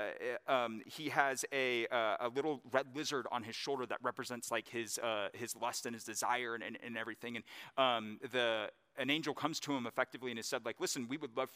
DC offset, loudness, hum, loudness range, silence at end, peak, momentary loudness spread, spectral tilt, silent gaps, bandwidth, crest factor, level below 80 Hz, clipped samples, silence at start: under 0.1%; -38 LUFS; none; 3 LU; 0 s; -14 dBFS; 8 LU; -2.5 dB/octave; none; 15.5 kHz; 26 dB; under -90 dBFS; under 0.1%; 0 s